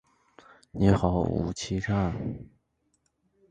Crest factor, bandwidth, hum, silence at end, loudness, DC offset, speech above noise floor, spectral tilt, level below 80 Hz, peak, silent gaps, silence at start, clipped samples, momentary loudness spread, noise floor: 22 dB; 9.4 kHz; none; 1.05 s; -27 LUFS; under 0.1%; 47 dB; -7 dB/octave; -44 dBFS; -8 dBFS; none; 0.75 s; under 0.1%; 14 LU; -73 dBFS